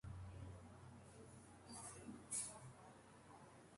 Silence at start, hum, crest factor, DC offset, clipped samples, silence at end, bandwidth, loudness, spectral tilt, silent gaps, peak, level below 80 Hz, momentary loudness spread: 0.05 s; none; 22 dB; under 0.1%; under 0.1%; 0 s; 11.5 kHz; -54 LUFS; -3.5 dB/octave; none; -34 dBFS; -68 dBFS; 17 LU